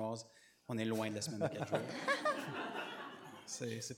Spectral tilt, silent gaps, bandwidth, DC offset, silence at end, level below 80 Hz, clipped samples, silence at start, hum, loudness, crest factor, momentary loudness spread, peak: -4 dB/octave; none; 17 kHz; under 0.1%; 0 s; -86 dBFS; under 0.1%; 0 s; none; -40 LUFS; 20 dB; 13 LU; -20 dBFS